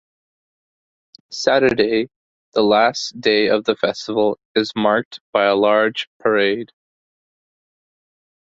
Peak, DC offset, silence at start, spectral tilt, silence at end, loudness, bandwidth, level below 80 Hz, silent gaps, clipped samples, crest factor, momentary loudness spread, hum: -2 dBFS; under 0.1%; 1.3 s; -4 dB/octave; 1.8 s; -18 LUFS; 7.8 kHz; -60 dBFS; 2.16-2.52 s, 4.45-4.55 s, 5.05-5.11 s, 5.21-5.33 s, 6.07-6.20 s; under 0.1%; 18 dB; 8 LU; none